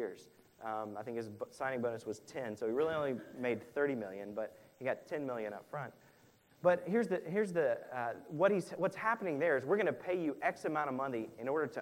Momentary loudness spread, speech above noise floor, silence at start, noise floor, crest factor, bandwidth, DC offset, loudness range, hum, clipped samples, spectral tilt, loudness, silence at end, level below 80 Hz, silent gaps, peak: 11 LU; 30 dB; 0 s; -66 dBFS; 20 dB; 16 kHz; under 0.1%; 5 LU; none; under 0.1%; -6.5 dB/octave; -37 LUFS; 0 s; -80 dBFS; none; -16 dBFS